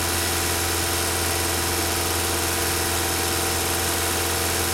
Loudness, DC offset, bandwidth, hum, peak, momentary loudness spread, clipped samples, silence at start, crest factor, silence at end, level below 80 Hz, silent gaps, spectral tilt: -22 LUFS; under 0.1%; 16.5 kHz; none; -10 dBFS; 0 LU; under 0.1%; 0 s; 14 dB; 0 s; -42 dBFS; none; -2.5 dB/octave